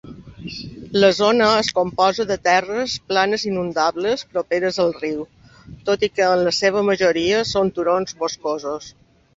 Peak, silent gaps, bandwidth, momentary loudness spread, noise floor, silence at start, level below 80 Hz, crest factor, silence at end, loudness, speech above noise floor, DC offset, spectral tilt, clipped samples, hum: -2 dBFS; none; 8 kHz; 13 LU; -43 dBFS; 0.05 s; -52 dBFS; 18 dB; 0.45 s; -19 LUFS; 24 dB; under 0.1%; -4 dB/octave; under 0.1%; none